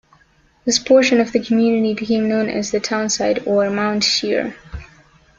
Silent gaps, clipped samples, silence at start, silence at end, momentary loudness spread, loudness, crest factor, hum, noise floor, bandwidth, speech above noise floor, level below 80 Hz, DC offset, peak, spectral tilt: none; under 0.1%; 0.65 s; 0.55 s; 11 LU; -17 LUFS; 16 dB; none; -55 dBFS; 7.8 kHz; 39 dB; -48 dBFS; under 0.1%; -2 dBFS; -3.5 dB/octave